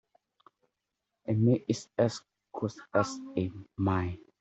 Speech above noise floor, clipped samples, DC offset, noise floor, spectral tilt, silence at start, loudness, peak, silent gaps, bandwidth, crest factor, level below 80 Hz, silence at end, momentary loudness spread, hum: 56 dB; under 0.1%; under 0.1%; -86 dBFS; -7 dB/octave; 1.25 s; -31 LUFS; -12 dBFS; none; 8.2 kHz; 20 dB; -66 dBFS; 0.25 s; 12 LU; none